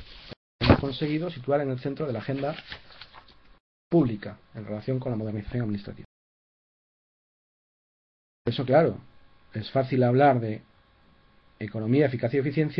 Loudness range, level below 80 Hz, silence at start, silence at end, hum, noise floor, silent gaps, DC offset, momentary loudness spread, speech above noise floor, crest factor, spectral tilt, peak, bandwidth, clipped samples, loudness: 9 LU; -48 dBFS; 0 s; 0 s; none; -59 dBFS; 0.37-0.59 s, 3.60-3.91 s, 6.05-8.45 s; under 0.1%; 20 LU; 33 dB; 24 dB; -9.5 dB/octave; -4 dBFS; 5.6 kHz; under 0.1%; -26 LUFS